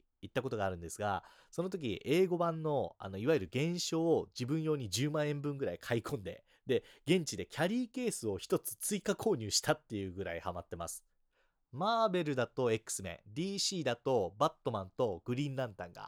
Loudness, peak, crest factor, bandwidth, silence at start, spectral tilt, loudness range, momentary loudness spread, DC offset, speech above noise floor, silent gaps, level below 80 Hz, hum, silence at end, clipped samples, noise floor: -36 LUFS; -16 dBFS; 20 dB; 19 kHz; 0.25 s; -4.5 dB/octave; 3 LU; 10 LU; under 0.1%; 41 dB; none; -68 dBFS; none; 0 s; under 0.1%; -76 dBFS